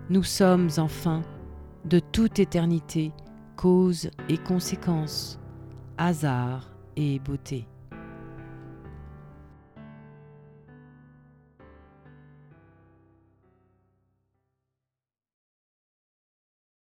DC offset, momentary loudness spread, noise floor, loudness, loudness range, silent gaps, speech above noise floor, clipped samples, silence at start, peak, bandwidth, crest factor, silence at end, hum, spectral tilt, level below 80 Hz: under 0.1%; 24 LU; under -90 dBFS; -26 LUFS; 21 LU; none; over 65 dB; under 0.1%; 0 s; -8 dBFS; 17 kHz; 22 dB; 6.15 s; none; -6.5 dB/octave; -50 dBFS